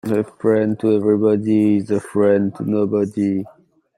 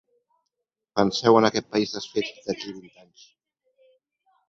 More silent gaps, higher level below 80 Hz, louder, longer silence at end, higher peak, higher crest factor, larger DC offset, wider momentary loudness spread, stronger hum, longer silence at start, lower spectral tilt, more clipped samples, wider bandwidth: neither; about the same, -62 dBFS vs -62 dBFS; first, -18 LUFS vs -23 LUFS; second, 0.5 s vs 1.7 s; about the same, -4 dBFS vs -4 dBFS; second, 14 dB vs 22 dB; neither; second, 5 LU vs 14 LU; neither; second, 0.05 s vs 0.95 s; first, -8.5 dB/octave vs -5 dB/octave; neither; first, 12 kHz vs 7.8 kHz